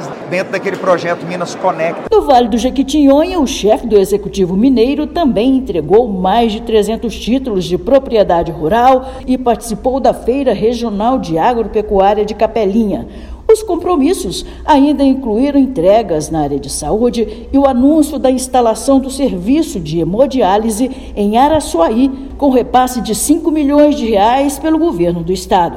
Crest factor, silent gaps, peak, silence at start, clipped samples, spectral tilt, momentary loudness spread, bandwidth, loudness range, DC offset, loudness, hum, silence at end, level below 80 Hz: 12 dB; none; 0 dBFS; 0 s; 0.3%; -5.5 dB/octave; 7 LU; 16 kHz; 2 LU; under 0.1%; -13 LUFS; none; 0 s; -32 dBFS